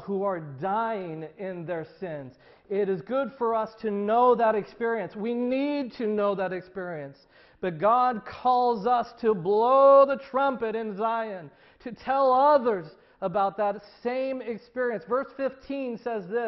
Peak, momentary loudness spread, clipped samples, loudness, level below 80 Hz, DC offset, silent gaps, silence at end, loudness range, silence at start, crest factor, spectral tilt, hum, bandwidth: -8 dBFS; 15 LU; under 0.1%; -26 LUFS; -68 dBFS; under 0.1%; none; 0 s; 8 LU; 0 s; 18 dB; -8.5 dB/octave; none; 6 kHz